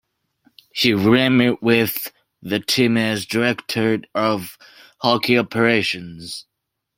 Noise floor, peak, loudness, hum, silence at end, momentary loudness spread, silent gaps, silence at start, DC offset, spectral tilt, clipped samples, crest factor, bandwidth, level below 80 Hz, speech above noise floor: -62 dBFS; -2 dBFS; -18 LUFS; none; 0.55 s; 16 LU; none; 0.75 s; under 0.1%; -5 dB/octave; under 0.1%; 18 dB; 16.5 kHz; -58 dBFS; 43 dB